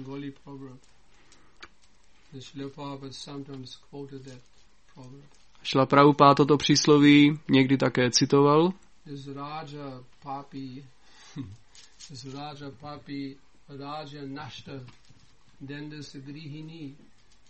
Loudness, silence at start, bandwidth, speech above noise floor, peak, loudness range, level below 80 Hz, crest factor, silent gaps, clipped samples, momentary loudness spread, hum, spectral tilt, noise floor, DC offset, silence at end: -21 LUFS; 0 s; 8.4 kHz; 35 dB; -4 dBFS; 22 LU; -62 dBFS; 24 dB; none; under 0.1%; 25 LU; none; -5 dB/octave; -61 dBFS; 0.2%; 0.6 s